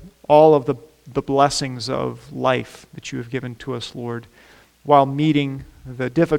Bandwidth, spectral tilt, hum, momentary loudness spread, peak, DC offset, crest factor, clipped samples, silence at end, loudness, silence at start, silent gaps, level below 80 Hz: 16 kHz; -6 dB/octave; none; 18 LU; 0 dBFS; under 0.1%; 20 dB; under 0.1%; 0 s; -20 LUFS; 0 s; none; -50 dBFS